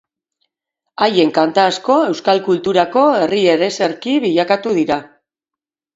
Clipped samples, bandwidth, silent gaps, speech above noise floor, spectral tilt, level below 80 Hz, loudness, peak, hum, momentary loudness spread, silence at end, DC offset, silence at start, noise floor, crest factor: under 0.1%; 8 kHz; none; 72 dB; -5 dB/octave; -60 dBFS; -15 LUFS; 0 dBFS; none; 5 LU; 0.9 s; under 0.1%; 1 s; -86 dBFS; 16 dB